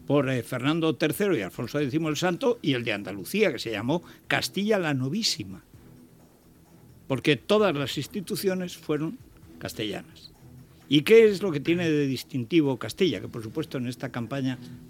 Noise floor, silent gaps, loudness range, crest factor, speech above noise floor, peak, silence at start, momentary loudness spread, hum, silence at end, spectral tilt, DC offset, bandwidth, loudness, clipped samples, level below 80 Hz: -55 dBFS; none; 5 LU; 20 dB; 30 dB; -6 dBFS; 0 s; 10 LU; none; 0 s; -5.5 dB/octave; under 0.1%; 16.5 kHz; -26 LUFS; under 0.1%; -62 dBFS